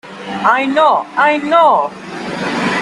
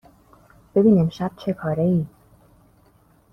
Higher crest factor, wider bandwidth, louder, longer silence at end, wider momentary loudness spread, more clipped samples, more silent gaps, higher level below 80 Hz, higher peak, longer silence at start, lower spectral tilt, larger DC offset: about the same, 14 dB vs 18 dB; first, 11.5 kHz vs 6.2 kHz; first, -13 LUFS vs -21 LUFS; second, 0 s vs 1.25 s; about the same, 13 LU vs 11 LU; neither; neither; about the same, -58 dBFS vs -54 dBFS; first, 0 dBFS vs -6 dBFS; second, 0.05 s vs 0.75 s; second, -4.5 dB/octave vs -9.5 dB/octave; neither